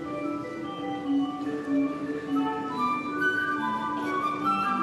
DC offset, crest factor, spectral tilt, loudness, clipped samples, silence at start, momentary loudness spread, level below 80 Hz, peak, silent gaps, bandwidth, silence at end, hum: under 0.1%; 14 dB; -5.5 dB/octave; -29 LUFS; under 0.1%; 0 s; 7 LU; -68 dBFS; -14 dBFS; none; 12.5 kHz; 0 s; none